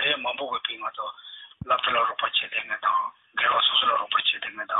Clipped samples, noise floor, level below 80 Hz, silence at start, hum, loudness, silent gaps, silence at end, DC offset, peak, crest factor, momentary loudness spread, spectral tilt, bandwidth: under 0.1%; -45 dBFS; -62 dBFS; 0 s; none; -24 LUFS; none; 0 s; under 0.1%; -10 dBFS; 16 dB; 15 LU; -6 dB/octave; 4.1 kHz